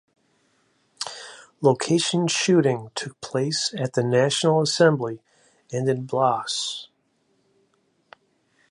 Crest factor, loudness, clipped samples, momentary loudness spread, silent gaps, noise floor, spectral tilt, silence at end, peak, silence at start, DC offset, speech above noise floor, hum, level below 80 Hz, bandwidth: 20 dB; -23 LUFS; under 0.1%; 14 LU; none; -68 dBFS; -4.5 dB/octave; 1.85 s; -4 dBFS; 1 s; under 0.1%; 46 dB; none; -70 dBFS; 11.5 kHz